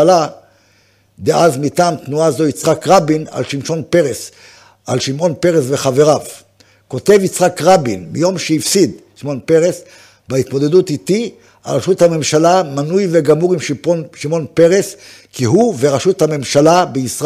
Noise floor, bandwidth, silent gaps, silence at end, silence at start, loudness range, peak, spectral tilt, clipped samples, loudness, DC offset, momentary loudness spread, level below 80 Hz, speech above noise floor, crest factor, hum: -53 dBFS; 16 kHz; none; 0 s; 0 s; 2 LU; 0 dBFS; -5 dB/octave; under 0.1%; -14 LUFS; under 0.1%; 10 LU; -54 dBFS; 40 dB; 14 dB; none